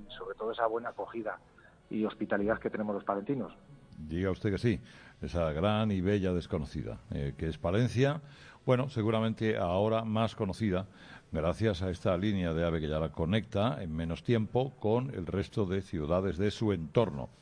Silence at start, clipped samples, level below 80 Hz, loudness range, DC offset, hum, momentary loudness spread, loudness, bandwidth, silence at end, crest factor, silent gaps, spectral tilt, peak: 0 s; under 0.1%; -50 dBFS; 4 LU; under 0.1%; none; 9 LU; -32 LUFS; 10.5 kHz; 0.1 s; 18 dB; none; -7.5 dB/octave; -14 dBFS